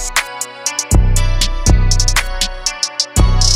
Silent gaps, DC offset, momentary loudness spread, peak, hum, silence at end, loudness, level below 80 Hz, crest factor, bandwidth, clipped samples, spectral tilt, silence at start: none; under 0.1%; 6 LU; 0 dBFS; none; 0 s; -15 LUFS; -16 dBFS; 14 dB; 15.5 kHz; under 0.1%; -3 dB/octave; 0 s